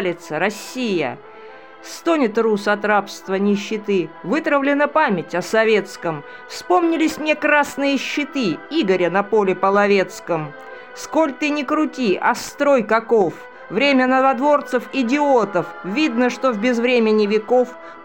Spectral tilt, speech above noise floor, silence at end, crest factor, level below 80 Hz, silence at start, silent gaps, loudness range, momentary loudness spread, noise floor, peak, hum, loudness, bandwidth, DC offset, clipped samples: -5 dB/octave; 22 dB; 0 s; 16 dB; -64 dBFS; 0 s; none; 3 LU; 10 LU; -40 dBFS; -4 dBFS; none; -18 LUFS; 17 kHz; 0.3%; under 0.1%